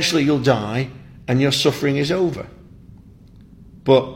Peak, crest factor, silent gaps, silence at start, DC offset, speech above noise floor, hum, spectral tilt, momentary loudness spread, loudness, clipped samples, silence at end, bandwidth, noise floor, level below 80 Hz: -2 dBFS; 18 dB; none; 0 s; under 0.1%; 27 dB; none; -5.5 dB/octave; 14 LU; -19 LUFS; under 0.1%; 0 s; 16.5 kHz; -45 dBFS; -48 dBFS